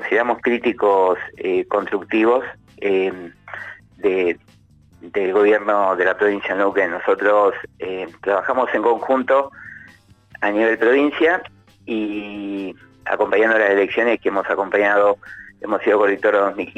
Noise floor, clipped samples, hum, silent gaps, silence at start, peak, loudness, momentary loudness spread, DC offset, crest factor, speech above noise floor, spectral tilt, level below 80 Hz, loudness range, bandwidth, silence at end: -48 dBFS; under 0.1%; none; none; 0 s; -4 dBFS; -18 LUFS; 14 LU; under 0.1%; 14 dB; 30 dB; -6 dB/octave; -60 dBFS; 3 LU; 8.2 kHz; 0.1 s